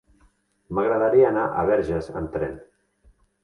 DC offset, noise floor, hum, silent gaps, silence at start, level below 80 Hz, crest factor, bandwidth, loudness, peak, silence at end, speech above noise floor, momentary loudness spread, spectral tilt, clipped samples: under 0.1%; -62 dBFS; none; none; 0.7 s; -48 dBFS; 16 dB; 6.4 kHz; -22 LUFS; -8 dBFS; 0.8 s; 40 dB; 12 LU; -8.5 dB/octave; under 0.1%